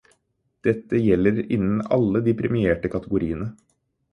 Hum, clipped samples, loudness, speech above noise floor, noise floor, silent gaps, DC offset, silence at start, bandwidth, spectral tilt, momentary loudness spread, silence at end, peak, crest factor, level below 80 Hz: none; under 0.1%; -22 LUFS; 50 dB; -71 dBFS; none; under 0.1%; 0.65 s; 6.4 kHz; -9.5 dB/octave; 7 LU; 0.6 s; -6 dBFS; 18 dB; -46 dBFS